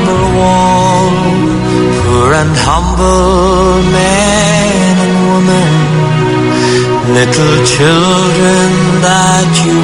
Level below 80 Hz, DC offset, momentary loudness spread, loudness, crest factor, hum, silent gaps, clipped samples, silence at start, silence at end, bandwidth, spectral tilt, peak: -24 dBFS; under 0.1%; 3 LU; -8 LUFS; 8 dB; none; none; 0.4%; 0 s; 0 s; 11 kHz; -5 dB/octave; 0 dBFS